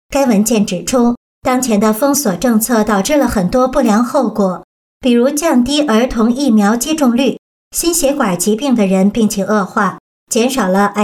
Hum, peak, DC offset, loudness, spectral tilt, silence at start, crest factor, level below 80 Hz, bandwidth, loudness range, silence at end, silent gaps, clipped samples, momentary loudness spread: none; -2 dBFS; under 0.1%; -13 LUFS; -4.5 dB/octave; 0.1 s; 10 dB; -38 dBFS; 18.5 kHz; 1 LU; 0 s; 1.17-1.42 s, 4.64-5.00 s, 7.39-7.71 s, 10.00-10.27 s; under 0.1%; 5 LU